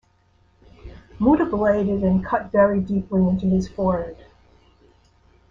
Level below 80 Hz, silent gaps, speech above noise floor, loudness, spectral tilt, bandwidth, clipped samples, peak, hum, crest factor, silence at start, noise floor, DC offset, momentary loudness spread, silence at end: -42 dBFS; none; 40 dB; -21 LUFS; -9.5 dB/octave; 6.8 kHz; under 0.1%; -4 dBFS; none; 18 dB; 0.85 s; -60 dBFS; under 0.1%; 5 LU; 1.35 s